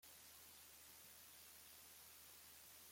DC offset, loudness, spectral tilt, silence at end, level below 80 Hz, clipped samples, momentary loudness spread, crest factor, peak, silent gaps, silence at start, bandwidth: under 0.1%; -60 LUFS; -0.5 dB/octave; 0 s; -86 dBFS; under 0.1%; 0 LU; 14 dB; -48 dBFS; none; 0 s; 16.5 kHz